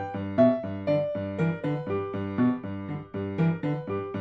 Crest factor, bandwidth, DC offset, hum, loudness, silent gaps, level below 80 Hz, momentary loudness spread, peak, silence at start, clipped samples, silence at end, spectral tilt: 18 dB; 5.8 kHz; under 0.1%; none; -28 LUFS; none; -64 dBFS; 10 LU; -10 dBFS; 0 s; under 0.1%; 0 s; -10 dB/octave